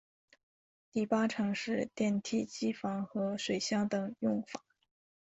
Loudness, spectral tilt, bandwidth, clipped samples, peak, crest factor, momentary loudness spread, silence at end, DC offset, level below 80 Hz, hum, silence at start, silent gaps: -34 LUFS; -5 dB/octave; 8 kHz; under 0.1%; -18 dBFS; 18 dB; 6 LU; 0.75 s; under 0.1%; -74 dBFS; none; 0.95 s; none